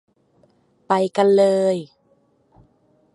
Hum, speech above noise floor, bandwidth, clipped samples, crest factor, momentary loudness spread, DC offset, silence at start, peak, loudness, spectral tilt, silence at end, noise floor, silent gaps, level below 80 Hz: none; 44 dB; 11.5 kHz; under 0.1%; 18 dB; 7 LU; under 0.1%; 0.9 s; -2 dBFS; -18 LUFS; -6 dB/octave; 1.3 s; -61 dBFS; none; -68 dBFS